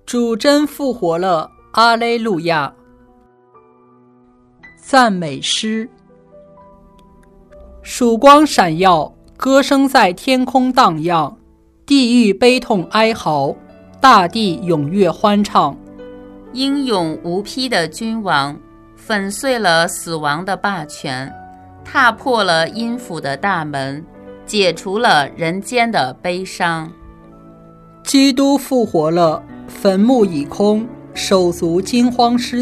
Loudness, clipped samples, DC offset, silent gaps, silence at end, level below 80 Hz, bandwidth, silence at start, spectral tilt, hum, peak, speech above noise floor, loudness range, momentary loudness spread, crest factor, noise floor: -15 LUFS; 0.2%; under 0.1%; none; 0 s; -48 dBFS; 14 kHz; 0.05 s; -4.5 dB/octave; none; 0 dBFS; 35 dB; 6 LU; 12 LU; 16 dB; -50 dBFS